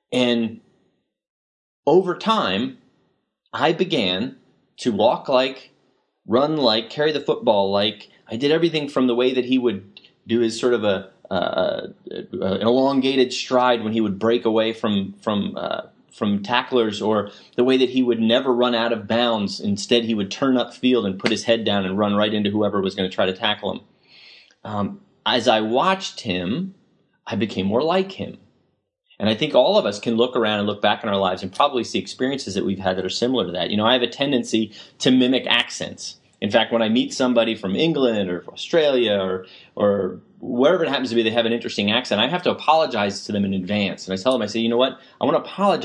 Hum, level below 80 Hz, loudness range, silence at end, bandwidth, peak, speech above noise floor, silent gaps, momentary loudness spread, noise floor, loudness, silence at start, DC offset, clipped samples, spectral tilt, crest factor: none; -70 dBFS; 3 LU; 0 s; 10.5 kHz; 0 dBFS; 48 dB; 1.30-1.83 s; 9 LU; -68 dBFS; -21 LUFS; 0.1 s; under 0.1%; under 0.1%; -5 dB/octave; 20 dB